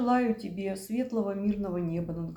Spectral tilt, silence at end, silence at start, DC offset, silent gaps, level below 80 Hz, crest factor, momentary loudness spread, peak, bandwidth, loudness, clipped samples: -7.5 dB/octave; 0 s; 0 s; under 0.1%; none; -56 dBFS; 14 dB; 7 LU; -16 dBFS; 19.5 kHz; -31 LUFS; under 0.1%